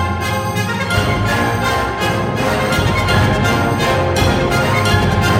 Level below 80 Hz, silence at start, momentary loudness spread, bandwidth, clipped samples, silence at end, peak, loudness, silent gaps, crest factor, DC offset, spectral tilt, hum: -28 dBFS; 0 s; 4 LU; 17 kHz; under 0.1%; 0 s; -2 dBFS; -15 LUFS; none; 14 dB; under 0.1%; -5 dB/octave; none